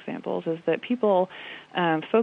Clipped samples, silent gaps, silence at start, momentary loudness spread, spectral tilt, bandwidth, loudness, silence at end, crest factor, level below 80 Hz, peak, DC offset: under 0.1%; none; 0 s; 9 LU; -8 dB/octave; 6.6 kHz; -26 LUFS; 0 s; 16 dB; -78 dBFS; -10 dBFS; under 0.1%